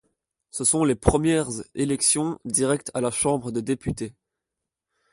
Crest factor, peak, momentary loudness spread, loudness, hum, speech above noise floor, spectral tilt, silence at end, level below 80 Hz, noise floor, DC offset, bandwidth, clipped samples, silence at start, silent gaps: 24 dB; -2 dBFS; 11 LU; -23 LUFS; none; 62 dB; -4 dB/octave; 1 s; -42 dBFS; -86 dBFS; under 0.1%; 11.5 kHz; under 0.1%; 0.55 s; none